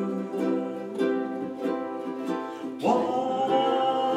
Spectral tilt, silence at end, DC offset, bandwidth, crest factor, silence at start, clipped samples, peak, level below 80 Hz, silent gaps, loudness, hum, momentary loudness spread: -6 dB/octave; 0 s; under 0.1%; 14 kHz; 16 dB; 0 s; under 0.1%; -10 dBFS; -80 dBFS; none; -28 LUFS; none; 8 LU